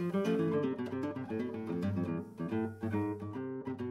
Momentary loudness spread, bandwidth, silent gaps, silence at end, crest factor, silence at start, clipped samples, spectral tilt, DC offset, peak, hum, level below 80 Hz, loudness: 8 LU; 13.5 kHz; none; 0 s; 14 dB; 0 s; under 0.1%; -8.5 dB/octave; under 0.1%; -20 dBFS; none; -70 dBFS; -36 LUFS